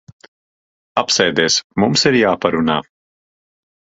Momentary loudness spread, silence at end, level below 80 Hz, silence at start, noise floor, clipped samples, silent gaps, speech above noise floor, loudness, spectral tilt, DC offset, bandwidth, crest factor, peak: 8 LU; 1.15 s; -52 dBFS; 0.95 s; under -90 dBFS; under 0.1%; 1.64-1.70 s; over 75 dB; -15 LUFS; -3.5 dB/octave; under 0.1%; 8 kHz; 18 dB; 0 dBFS